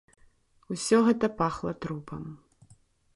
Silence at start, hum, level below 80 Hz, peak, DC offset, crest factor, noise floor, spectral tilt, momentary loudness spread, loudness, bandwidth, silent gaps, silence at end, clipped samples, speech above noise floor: 0.7 s; none; -58 dBFS; -10 dBFS; under 0.1%; 20 dB; -62 dBFS; -5.5 dB/octave; 18 LU; -27 LUFS; 11.5 kHz; none; 0.8 s; under 0.1%; 34 dB